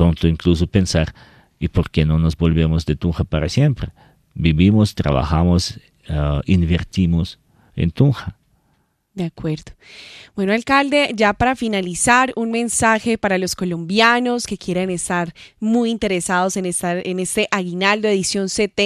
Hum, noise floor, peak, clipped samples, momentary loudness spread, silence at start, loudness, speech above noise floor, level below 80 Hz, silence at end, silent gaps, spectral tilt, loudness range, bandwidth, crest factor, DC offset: none; -64 dBFS; 0 dBFS; under 0.1%; 12 LU; 0 s; -18 LUFS; 46 dB; -36 dBFS; 0 s; none; -5 dB/octave; 4 LU; 14 kHz; 18 dB; under 0.1%